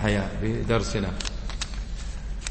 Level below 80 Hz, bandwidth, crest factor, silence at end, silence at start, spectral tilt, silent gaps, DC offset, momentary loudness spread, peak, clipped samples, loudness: -32 dBFS; 8.8 kHz; 18 dB; 0 s; 0 s; -5 dB/octave; none; under 0.1%; 11 LU; -10 dBFS; under 0.1%; -29 LUFS